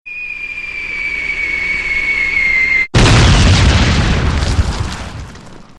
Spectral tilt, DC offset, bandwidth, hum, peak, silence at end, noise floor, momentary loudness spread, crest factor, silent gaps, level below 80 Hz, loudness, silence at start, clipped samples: -4.5 dB/octave; 0.5%; 11 kHz; none; -2 dBFS; 0.15 s; -34 dBFS; 14 LU; 12 dB; none; -20 dBFS; -13 LUFS; 0.05 s; under 0.1%